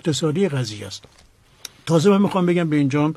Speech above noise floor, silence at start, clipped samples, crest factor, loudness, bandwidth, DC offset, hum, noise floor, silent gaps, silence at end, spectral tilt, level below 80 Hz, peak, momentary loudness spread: 24 dB; 0.05 s; under 0.1%; 16 dB; -19 LUFS; 13 kHz; under 0.1%; none; -43 dBFS; none; 0 s; -6.5 dB/octave; -60 dBFS; -4 dBFS; 19 LU